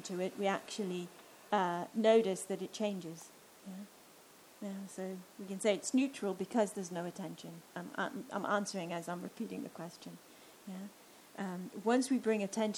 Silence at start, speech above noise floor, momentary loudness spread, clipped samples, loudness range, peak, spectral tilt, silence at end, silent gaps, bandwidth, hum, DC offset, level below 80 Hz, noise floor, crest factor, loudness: 0 s; 23 dB; 19 LU; under 0.1%; 7 LU; -18 dBFS; -4.5 dB/octave; 0 s; none; over 20 kHz; none; under 0.1%; -86 dBFS; -60 dBFS; 20 dB; -37 LUFS